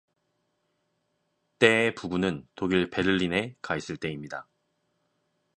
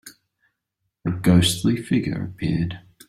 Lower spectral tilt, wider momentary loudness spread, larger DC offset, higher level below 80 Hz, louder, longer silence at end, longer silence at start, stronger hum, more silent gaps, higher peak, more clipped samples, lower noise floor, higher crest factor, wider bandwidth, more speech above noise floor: about the same, -5.5 dB/octave vs -5.5 dB/octave; about the same, 13 LU vs 12 LU; neither; second, -58 dBFS vs -48 dBFS; second, -26 LUFS vs -22 LUFS; first, 1.15 s vs 0.3 s; first, 1.6 s vs 0.05 s; neither; neither; about the same, -2 dBFS vs -4 dBFS; neither; about the same, -76 dBFS vs -78 dBFS; first, 26 dB vs 20 dB; second, 10.5 kHz vs 15 kHz; second, 49 dB vs 58 dB